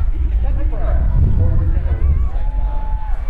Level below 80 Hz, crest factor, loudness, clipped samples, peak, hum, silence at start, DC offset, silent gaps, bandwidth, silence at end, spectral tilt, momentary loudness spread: -16 dBFS; 10 dB; -19 LUFS; under 0.1%; -4 dBFS; none; 0 s; under 0.1%; none; 3.2 kHz; 0 s; -10.5 dB/octave; 7 LU